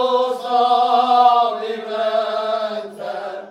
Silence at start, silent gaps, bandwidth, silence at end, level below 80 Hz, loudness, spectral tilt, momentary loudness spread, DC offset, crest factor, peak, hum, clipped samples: 0 s; none; 11 kHz; 0 s; -78 dBFS; -18 LUFS; -3.5 dB/octave; 15 LU; under 0.1%; 16 dB; -2 dBFS; none; under 0.1%